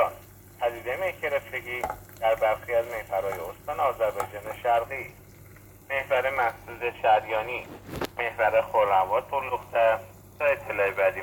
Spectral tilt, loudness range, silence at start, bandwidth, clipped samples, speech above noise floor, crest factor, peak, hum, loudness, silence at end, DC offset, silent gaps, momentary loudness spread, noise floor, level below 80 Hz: -4.5 dB/octave; 4 LU; 0 s; 20 kHz; under 0.1%; 23 dB; 18 dB; -10 dBFS; none; -27 LUFS; 0 s; under 0.1%; none; 11 LU; -49 dBFS; -54 dBFS